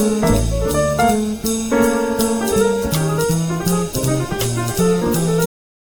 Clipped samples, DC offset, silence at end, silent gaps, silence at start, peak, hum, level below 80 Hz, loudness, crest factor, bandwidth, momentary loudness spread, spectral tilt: under 0.1%; under 0.1%; 0.35 s; none; 0 s; -2 dBFS; none; -30 dBFS; -18 LUFS; 14 dB; over 20 kHz; 4 LU; -5.5 dB/octave